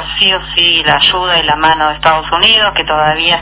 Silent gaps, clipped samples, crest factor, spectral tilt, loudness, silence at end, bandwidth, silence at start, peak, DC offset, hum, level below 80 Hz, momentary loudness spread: none; 0.3%; 10 dB; -7 dB/octave; -9 LUFS; 0 s; 4 kHz; 0 s; 0 dBFS; under 0.1%; none; -34 dBFS; 4 LU